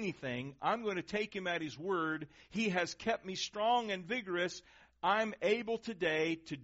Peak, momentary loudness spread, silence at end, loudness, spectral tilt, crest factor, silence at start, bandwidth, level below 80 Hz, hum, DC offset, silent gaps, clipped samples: -18 dBFS; 7 LU; 0 s; -36 LUFS; -2.5 dB/octave; 18 dB; 0 s; 8 kHz; -70 dBFS; none; under 0.1%; none; under 0.1%